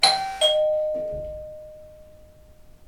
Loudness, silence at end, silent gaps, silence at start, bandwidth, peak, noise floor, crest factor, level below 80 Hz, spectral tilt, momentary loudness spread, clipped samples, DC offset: -22 LUFS; 0 s; none; 0 s; 16 kHz; -2 dBFS; -49 dBFS; 24 dB; -50 dBFS; -1 dB/octave; 22 LU; under 0.1%; under 0.1%